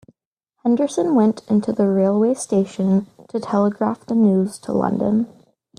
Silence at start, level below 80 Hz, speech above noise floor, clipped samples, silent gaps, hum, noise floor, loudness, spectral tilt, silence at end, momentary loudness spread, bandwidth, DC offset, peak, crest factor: 0.65 s; -60 dBFS; 57 dB; under 0.1%; none; none; -75 dBFS; -19 LUFS; -7.5 dB/octave; 0.5 s; 6 LU; 10.5 kHz; under 0.1%; -4 dBFS; 14 dB